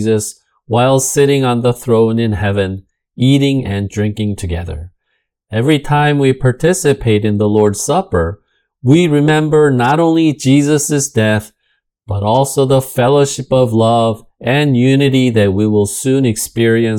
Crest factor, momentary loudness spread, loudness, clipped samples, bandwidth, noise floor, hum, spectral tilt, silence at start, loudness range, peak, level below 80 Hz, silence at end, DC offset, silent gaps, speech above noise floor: 12 dB; 8 LU; -13 LUFS; under 0.1%; 18 kHz; -68 dBFS; none; -5.5 dB/octave; 0 s; 3 LU; 0 dBFS; -40 dBFS; 0 s; under 0.1%; none; 55 dB